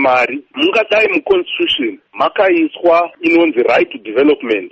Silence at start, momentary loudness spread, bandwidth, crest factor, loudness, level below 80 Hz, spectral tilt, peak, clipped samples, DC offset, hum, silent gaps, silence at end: 0 s; 5 LU; 7.8 kHz; 12 dB; -13 LUFS; -54 dBFS; -5 dB/octave; -2 dBFS; under 0.1%; under 0.1%; none; none; 0.05 s